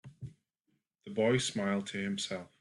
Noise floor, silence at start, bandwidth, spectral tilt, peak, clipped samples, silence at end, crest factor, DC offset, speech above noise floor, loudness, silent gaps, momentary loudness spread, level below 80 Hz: -80 dBFS; 0.05 s; 11.5 kHz; -4.5 dB/octave; -18 dBFS; under 0.1%; 0.15 s; 18 dB; under 0.1%; 47 dB; -33 LUFS; none; 20 LU; -70 dBFS